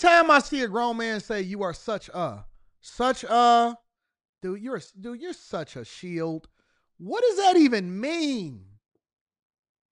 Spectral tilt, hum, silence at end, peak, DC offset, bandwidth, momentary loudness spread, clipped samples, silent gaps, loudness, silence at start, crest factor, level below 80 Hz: -4.5 dB/octave; none; 1.3 s; -4 dBFS; under 0.1%; 11 kHz; 19 LU; under 0.1%; 4.29-4.33 s; -24 LUFS; 0 s; 22 dB; -58 dBFS